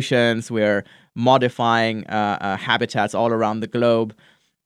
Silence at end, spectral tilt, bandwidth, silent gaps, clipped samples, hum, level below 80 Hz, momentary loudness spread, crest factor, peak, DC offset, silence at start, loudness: 0.55 s; -5.5 dB/octave; 12.5 kHz; none; under 0.1%; none; -68 dBFS; 6 LU; 20 dB; -2 dBFS; under 0.1%; 0 s; -20 LUFS